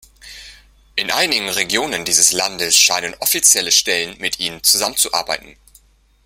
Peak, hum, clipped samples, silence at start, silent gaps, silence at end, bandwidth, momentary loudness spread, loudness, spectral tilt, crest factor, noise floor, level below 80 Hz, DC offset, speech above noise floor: 0 dBFS; none; under 0.1%; 0.25 s; none; 0.75 s; 17 kHz; 11 LU; -14 LUFS; 0.5 dB/octave; 18 dB; -52 dBFS; -52 dBFS; under 0.1%; 34 dB